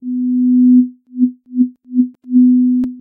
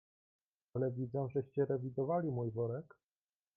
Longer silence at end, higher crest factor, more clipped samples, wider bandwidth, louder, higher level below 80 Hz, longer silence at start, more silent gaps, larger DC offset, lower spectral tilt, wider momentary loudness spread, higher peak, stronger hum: second, 0 s vs 0.7 s; second, 10 dB vs 16 dB; neither; second, 0.7 kHz vs 2.8 kHz; first, -14 LUFS vs -38 LUFS; first, -58 dBFS vs -74 dBFS; second, 0 s vs 0.75 s; neither; neither; about the same, -11 dB/octave vs -12 dB/octave; first, 8 LU vs 4 LU; first, -2 dBFS vs -22 dBFS; neither